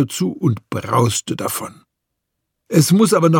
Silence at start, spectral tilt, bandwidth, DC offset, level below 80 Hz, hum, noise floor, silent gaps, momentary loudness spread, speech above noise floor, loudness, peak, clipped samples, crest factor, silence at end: 0 s; -5.5 dB/octave; 17.5 kHz; under 0.1%; -58 dBFS; none; -77 dBFS; none; 11 LU; 61 dB; -18 LUFS; 0 dBFS; under 0.1%; 18 dB; 0 s